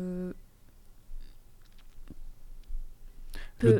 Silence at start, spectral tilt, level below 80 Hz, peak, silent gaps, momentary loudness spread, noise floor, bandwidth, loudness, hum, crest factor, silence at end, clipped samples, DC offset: 0 s; -8.5 dB/octave; -42 dBFS; -10 dBFS; none; 23 LU; -53 dBFS; 16 kHz; -38 LUFS; none; 22 dB; 0 s; under 0.1%; under 0.1%